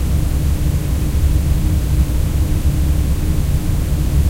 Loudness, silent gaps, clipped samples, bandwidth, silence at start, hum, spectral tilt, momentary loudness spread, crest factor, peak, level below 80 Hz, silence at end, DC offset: -18 LUFS; none; under 0.1%; 16 kHz; 0 s; none; -6.5 dB/octave; 2 LU; 12 dB; -4 dBFS; -16 dBFS; 0 s; under 0.1%